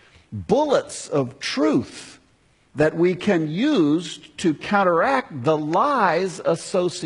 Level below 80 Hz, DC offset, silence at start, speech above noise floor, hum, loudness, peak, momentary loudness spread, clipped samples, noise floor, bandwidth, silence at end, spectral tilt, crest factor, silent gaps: -58 dBFS; under 0.1%; 0.3 s; 39 dB; none; -21 LUFS; -4 dBFS; 7 LU; under 0.1%; -59 dBFS; 11 kHz; 0 s; -5.5 dB/octave; 18 dB; none